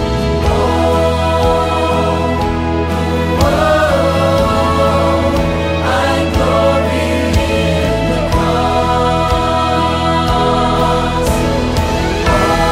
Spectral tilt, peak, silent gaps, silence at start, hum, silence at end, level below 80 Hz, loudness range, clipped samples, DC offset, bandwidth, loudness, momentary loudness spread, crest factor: -6 dB/octave; -2 dBFS; none; 0 s; none; 0 s; -22 dBFS; 1 LU; under 0.1%; under 0.1%; 16 kHz; -13 LUFS; 3 LU; 12 dB